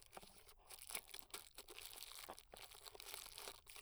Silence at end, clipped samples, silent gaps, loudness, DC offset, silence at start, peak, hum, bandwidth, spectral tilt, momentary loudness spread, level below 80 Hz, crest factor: 0 s; under 0.1%; none; -54 LUFS; under 0.1%; 0 s; -24 dBFS; none; over 20 kHz; 0 dB/octave; 10 LU; -74 dBFS; 32 dB